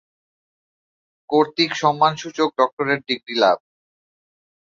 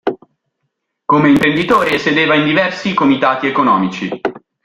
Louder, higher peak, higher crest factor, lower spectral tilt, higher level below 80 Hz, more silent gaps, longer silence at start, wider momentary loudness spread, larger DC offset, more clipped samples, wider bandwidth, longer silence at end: second, -20 LUFS vs -13 LUFS; about the same, -2 dBFS vs 0 dBFS; first, 20 dB vs 14 dB; second, -4.5 dB/octave vs -6 dB/octave; second, -70 dBFS vs -50 dBFS; first, 2.73-2.77 s vs none; first, 1.3 s vs 0.05 s; second, 5 LU vs 12 LU; neither; neither; second, 7.6 kHz vs 13.5 kHz; first, 1.15 s vs 0.25 s